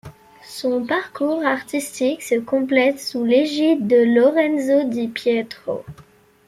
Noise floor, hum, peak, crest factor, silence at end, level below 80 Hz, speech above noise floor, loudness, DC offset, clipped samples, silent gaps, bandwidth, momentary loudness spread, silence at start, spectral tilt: -41 dBFS; none; -4 dBFS; 16 dB; 0.45 s; -62 dBFS; 23 dB; -19 LUFS; under 0.1%; under 0.1%; none; 15 kHz; 11 LU; 0.05 s; -4.5 dB/octave